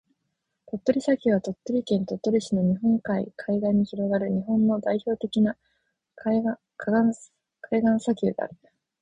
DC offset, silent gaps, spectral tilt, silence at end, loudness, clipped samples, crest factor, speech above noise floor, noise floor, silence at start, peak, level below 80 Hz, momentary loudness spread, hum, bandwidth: under 0.1%; none; -7.5 dB/octave; 0.5 s; -25 LUFS; under 0.1%; 18 dB; 55 dB; -79 dBFS; 0.75 s; -8 dBFS; -60 dBFS; 7 LU; none; 9.8 kHz